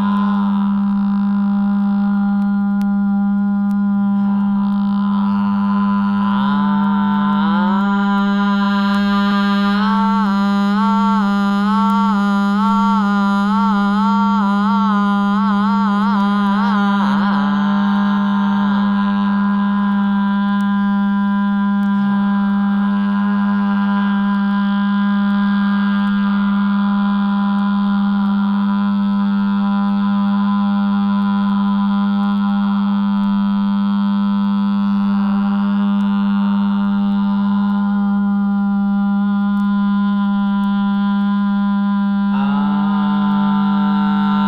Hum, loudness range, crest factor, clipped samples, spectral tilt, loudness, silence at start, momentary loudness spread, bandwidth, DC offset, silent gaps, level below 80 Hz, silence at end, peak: none; 1 LU; 10 dB; under 0.1%; -8.5 dB/octave; -16 LUFS; 0 s; 2 LU; 5.4 kHz; under 0.1%; none; -52 dBFS; 0 s; -4 dBFS